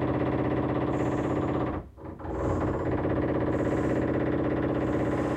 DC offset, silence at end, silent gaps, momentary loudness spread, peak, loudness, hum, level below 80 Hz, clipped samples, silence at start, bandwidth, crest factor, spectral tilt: under 0.1%; 0 s; none; 5 LU; -14 dBFS; -28 LUFS; none; -44 dBFS; under 0.1%; 0 s; 8.8 kHz; 14 dB; -8.5 dB/octave